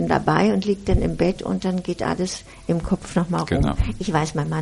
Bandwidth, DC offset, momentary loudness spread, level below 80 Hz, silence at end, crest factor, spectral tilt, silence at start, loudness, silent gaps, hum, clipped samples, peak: 11.5 kHz; under 0.1%; 7 LU; -32 dBFS; 0 s; 20 dB; -6.5 dB/octave; 0 s; -22 LUFS; none; none; under 0.1%; -2 dBFS